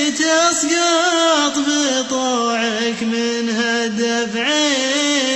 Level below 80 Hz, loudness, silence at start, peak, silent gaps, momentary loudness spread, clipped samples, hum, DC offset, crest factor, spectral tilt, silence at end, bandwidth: -60 dBFS; -16 LUFS; 0 s; -4 dBFS; none; 5 LU; under 0.1%; none; under 0.1%; 12 dB; -1.5 dB/octave; 0 s; 12.5 kHz